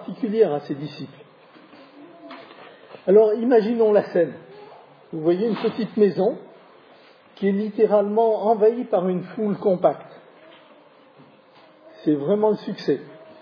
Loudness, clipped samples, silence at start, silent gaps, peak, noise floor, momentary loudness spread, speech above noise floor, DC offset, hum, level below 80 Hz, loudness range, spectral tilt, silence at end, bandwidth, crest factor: -21 LUFS; under 0.1%; 0 s; none; -4 dBFS; -51 dBFS; 17 LU; 31 dB; under 0.1%; none; -80 dBFS; 6 LU; -9.5 dB/octave; 0.25 s; 5.4 kHz; 18 dB